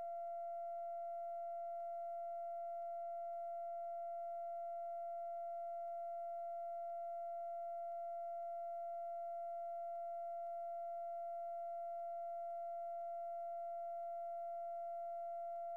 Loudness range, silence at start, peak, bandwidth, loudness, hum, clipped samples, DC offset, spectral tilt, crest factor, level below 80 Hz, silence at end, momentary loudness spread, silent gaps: 0 LU; 0 s; -42 dBFS; 2.9 kHz; -46 LUFS; none; under 0.1%; under 0.1%; -4 dB/octave; 4 dB; under -90 dBFS; 0 s; 0 LU; none